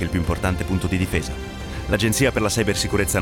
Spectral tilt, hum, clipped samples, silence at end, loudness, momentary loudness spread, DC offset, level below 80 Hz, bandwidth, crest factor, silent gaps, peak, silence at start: -4.5 dB/octave; none; under 0.1%; 0 s; -22 LUFS; 11 LU; under 0.1%; -34 dBFS; 19 kHz; 18 dB; none; -4 dBFS; 0 s